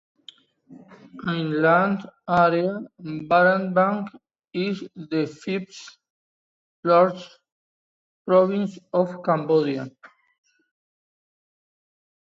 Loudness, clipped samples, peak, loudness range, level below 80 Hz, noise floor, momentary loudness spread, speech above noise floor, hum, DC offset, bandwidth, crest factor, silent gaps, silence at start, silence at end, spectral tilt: -22 LUFS; under 0.1%; -6 dBFS; 6 LU; -68 dBFS; -51 dBFS; 16 LU; 29 dB; none; under 0.1%; 7.8 kHz; 18 dB; 6.10-6.83 s, 7.52-8.25 s; 0.7 s; 2.4 s; -7 dB/octave